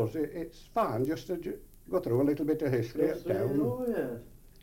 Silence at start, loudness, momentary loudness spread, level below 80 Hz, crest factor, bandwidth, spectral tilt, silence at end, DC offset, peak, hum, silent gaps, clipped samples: 0 s; -32 LUFS; 10 LU; -54 dBFS; 16 dB; 17 kHz; -8 dB/octave; 0.25 s; under 0.1%; -16 dBFS; none; none; under 0.1%